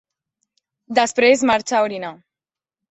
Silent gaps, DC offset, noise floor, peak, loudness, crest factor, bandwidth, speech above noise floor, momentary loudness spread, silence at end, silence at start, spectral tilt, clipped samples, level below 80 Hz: none; under 0.1%; under -90 dBFS; -2 dBFS; -17 LUFS; 18 dB; 8.4 kHz; over 73 dB; 13 LU; 0.75 s; 0.9 s; -2.5 dB/octave; under 0.1%; -62 dBFS